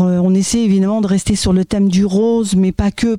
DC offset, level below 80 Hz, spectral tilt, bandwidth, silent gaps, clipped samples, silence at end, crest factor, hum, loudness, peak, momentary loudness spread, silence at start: 0.3%; -32 dBFS; -6 dB/octave; 12 kHz; none; under 0.1%; 0 s; 10 dB; none; -14 LUFS; -4 dBFS; 2 LU; 0 s